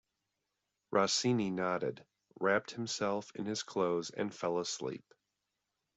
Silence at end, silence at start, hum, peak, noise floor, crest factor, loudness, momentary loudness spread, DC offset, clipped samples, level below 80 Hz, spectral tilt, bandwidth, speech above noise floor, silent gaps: 1 s; 0.9 s; none; -16 dBFS; -86 dBFS; 20 dB; -35 LUFS; 9 LU; under 0.1%; under 0.1%; -76 dBFS; -4 dB/octave; 8.2 kHz; 52 dB; none